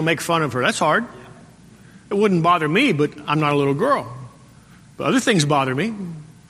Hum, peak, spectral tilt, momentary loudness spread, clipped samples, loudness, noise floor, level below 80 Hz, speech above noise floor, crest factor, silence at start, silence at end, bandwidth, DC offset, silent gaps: none; -2 dBFS; -5 dB/octave; 11 LU; under 0.1%; -19 LUFS; -47 dBFS; -58 dBFS; 28 dB; 18 dB; 0 s; 0.2 s; 15 kHz; under 0.1%; none